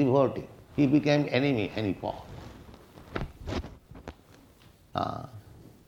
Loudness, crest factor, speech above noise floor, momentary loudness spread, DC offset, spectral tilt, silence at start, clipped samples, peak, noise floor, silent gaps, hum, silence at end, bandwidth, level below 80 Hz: -29 LUFS; 20 dB; 30 dB; 23 LU; under 0.1%; -7.5 dB/octave; 0 s; under 0.1%; -10 dBFS; -57 dBFS; none; none; 0.5 s; 8.4 kHz; -50 dBFS